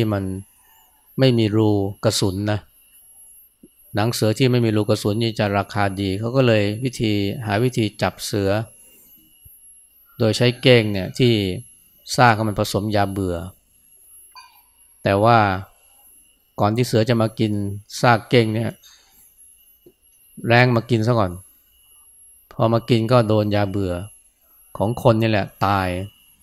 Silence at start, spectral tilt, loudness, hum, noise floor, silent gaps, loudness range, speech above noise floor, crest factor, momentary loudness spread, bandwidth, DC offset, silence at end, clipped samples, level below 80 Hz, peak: 0 s; -6 dB/octave; -20 LUFS; none; -54 dBFS; none; 3 LU; 36 dB; 20 dB; 13 LU; 15 kHz; under 0.1%; 0.35 s; under 0.1%; -52 dBFS; 0 dBFS